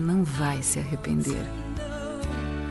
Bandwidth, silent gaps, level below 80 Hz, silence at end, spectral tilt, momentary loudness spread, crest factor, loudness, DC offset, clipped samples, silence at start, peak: 11.5 kHz; none; -38 dBFS; 0 s; -5 dB/octave; 9 LU; 16 dB; -28 LUFS; under 0.1%; under 0.1%; 0 s; -12 dBFS